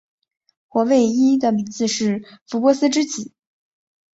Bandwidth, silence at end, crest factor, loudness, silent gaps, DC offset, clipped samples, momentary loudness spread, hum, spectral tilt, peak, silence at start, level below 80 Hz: 8 kHz; 0.9 s; 18 dB; -19 LUFS; 2.41-2.46 s; under 0.1%; under 0.1%; 12 LU; none; -4.5 dB/octave; -2 dBFS; 0.75 s; -64 dBFS